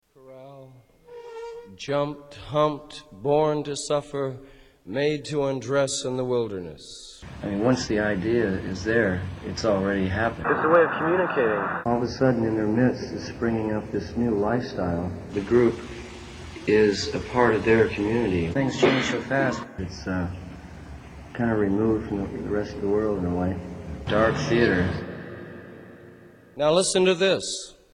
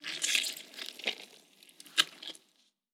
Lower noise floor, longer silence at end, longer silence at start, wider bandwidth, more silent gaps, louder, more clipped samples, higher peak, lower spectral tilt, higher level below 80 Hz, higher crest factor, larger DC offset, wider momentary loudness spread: second, -50 dBFS vs -72 dBFS; second, 0.2 s vs 0.55 s; first, 0.25 s vs 0 s; second, 10.5 kHz vs 19 kHz; neither; first, -24 LUFS vs -32 LUFS; neither; about the same, -6 dBFS vs -8 dBFS; first, -5.5 dB/octave vs 2 dB/octave; first, -48 dBFS vs under -90 dBFS; second, 18 dB vs 30 dB; neither; second, 19 LU vs 22 LU